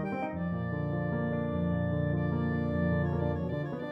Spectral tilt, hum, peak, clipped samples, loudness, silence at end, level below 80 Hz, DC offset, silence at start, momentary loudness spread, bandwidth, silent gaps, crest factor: -10.5 dB/octave; none; -18 dBFS; under 0.1%; -32 LUFS; 0 s; -50 dBFS; under 0.1%; 0 s; 4 LU; 5 kHz; none; 14 dB